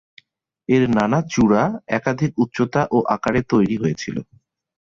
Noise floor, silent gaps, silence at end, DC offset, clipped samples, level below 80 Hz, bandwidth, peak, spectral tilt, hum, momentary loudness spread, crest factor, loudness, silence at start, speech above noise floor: -53 dBFS; none; 0.65 s; under 0.1%; under 0.1%; -48 dBFS; 7.6 kHz; -4 dBFS; -7 dB/octave; none; 7 LU; 16 dB; -19 LUFS; 0.7 s; 35 dB